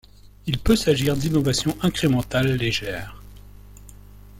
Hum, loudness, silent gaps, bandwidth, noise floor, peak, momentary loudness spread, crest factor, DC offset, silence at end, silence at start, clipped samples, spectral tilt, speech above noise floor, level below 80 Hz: 50 Hz at -40 dBFS; -22 LUFS; none; 17 kHz; -44 dBFS; -6 dBFS; 12 LU; 18 dB; under 0.1%; 0 s; 0.45 s; under 0.1%; -5 dB/octave; 22 dB; -38 dBFS